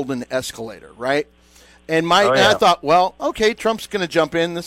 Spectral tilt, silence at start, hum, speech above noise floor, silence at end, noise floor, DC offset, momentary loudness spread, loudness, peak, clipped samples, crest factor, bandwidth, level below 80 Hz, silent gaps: -4 dB/octave; 0 s; none; 31 dB; 0 s; -49 dBFS; under 0.1%; 14 LU; -18 LUFS; -4 dBFS; under 0.1%; 14 dB; 16 kHz; -50 dBFS; none